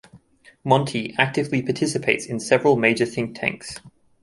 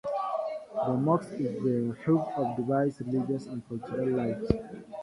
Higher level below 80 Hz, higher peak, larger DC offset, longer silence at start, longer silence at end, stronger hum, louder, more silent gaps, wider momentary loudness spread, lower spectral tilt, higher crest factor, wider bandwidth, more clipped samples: second, -60 dBFS vs -52 dBFS; first, -2 dBFS vs -8 dBFS; neither; about the same, 0.15 s vs 0.05 s; first, 0.35 s vs 0 s; neither; first, -21 LUFS vs -30 LUFS; neither; first, 13 LU vs 7 LU; second, -5 dB/octave vs -9 dB/octave; about the same, 20 dB vs 22 dB; about the same, 11.5 kHz vs 11.5 kHz; neither